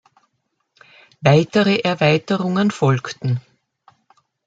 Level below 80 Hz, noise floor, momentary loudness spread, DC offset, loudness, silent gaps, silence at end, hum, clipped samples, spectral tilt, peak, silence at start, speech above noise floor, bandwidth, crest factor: -60 dBFS; -72 dBFS; 9 LU; under 0.1%; -18 LUFS; none; 1.05 s; none; under 0.1%; -6.5 dB/octave; 0 dBFS; 1.2 s; 55 dB; 8 kHz; 18 dB